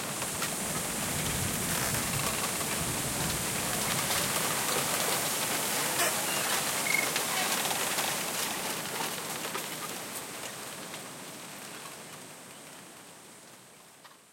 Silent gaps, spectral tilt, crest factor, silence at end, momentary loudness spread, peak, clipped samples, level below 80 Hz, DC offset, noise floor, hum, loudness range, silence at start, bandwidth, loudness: none; -1.5 dB/octave; 18 dB; 0.1 s; 17 LU; -14 dBFS; under 0.1%; -58 dBFS; under 0.1%; -54 dBFS; none; 14 LU; 0 s; 16.5 kHz; -30 LUFS